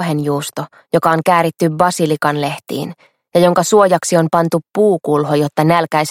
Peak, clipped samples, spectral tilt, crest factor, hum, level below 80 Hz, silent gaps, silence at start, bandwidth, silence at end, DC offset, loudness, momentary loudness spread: 0 dBFS; under 0.1%; -5.5 dB/octave; 14 dB; none; -58 dBFS; none; 0 s; 16.5 kHz; 0 s; under 0.1%; -15 LUFS; 10 LU